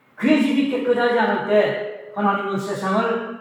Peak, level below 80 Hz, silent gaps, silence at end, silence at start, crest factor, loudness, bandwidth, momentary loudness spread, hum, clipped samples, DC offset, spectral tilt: -4 dBFS; -80 dBFS; none; 0 s; 0.2 s; 16 dB; -20 LUFS; 13 kHz; 7 LU; none; under 0.1%; under 0.1%; -6 dB/octave